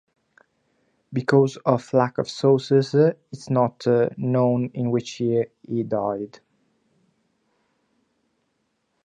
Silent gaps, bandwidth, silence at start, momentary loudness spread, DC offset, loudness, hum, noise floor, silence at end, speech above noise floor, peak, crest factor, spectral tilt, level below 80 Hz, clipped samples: none; 9.4 kHz; 1.1 s; 9 LU; under 0.1%; -22 LUFS; none; -72 dBFS; 2.8 s; 51 dB; -4 dBFS; 20 dB; -7.5 dB/octave; -68 dBFS; under 0.1%